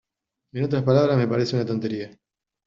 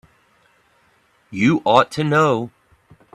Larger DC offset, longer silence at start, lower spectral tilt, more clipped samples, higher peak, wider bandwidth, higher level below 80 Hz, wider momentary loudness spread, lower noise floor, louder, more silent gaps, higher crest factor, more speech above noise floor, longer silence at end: neither; second, 0.55 s vs 1.3 s; about the same, -7 dB/octave vs -6 dB/octave; neither; second, -6 dBFS vs 0 dBFS; second, 7.4 kHz vs 12.5 kHz; about the same, -60 dBFS vs -58 dBFS; about the same, 15 LU vs 15 LU; first, -81 dBFS vs -59 dBFS; second, -23 LUFS vs -17 LUFS; neither; about the same, 18 dB vs 20 dB; first, 59 dB vs 43 dB; about the same, 0.6 s vs 0.65 s